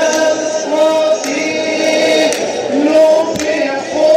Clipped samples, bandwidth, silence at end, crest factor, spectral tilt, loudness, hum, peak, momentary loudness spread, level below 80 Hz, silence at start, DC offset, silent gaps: under 0.1%; 15.5 kHz; 0 s; 12 dB; -2.5 dB/octave; -13 LUFS; none; 0 dBFS; 6 LU; -54 dBFS; 0 s; under 0.1%; none